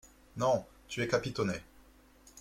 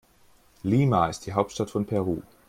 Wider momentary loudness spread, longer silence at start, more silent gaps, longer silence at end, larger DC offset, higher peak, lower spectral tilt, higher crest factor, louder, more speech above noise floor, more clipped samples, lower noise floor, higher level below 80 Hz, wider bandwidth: first, 11 LU vs 8 LU; second, 0.05 s vs 0.65 s; neither; second, 0 s vs 0.25 s; neither; second, -14 dBFS vs -8 dBFS; second, -5 dB/octave vs -7 dB/octave; about the same, 22 dB vs 20 dB; second, -34 LUFS vs -26 LUFS; second, 28 dB vs 34 dB; neither; about the same, -60 dBFS vs -58 dBFS; second, -60 dBFS vs -54 dBFS; about the same, 16.5 kHz vs 15.5 kHz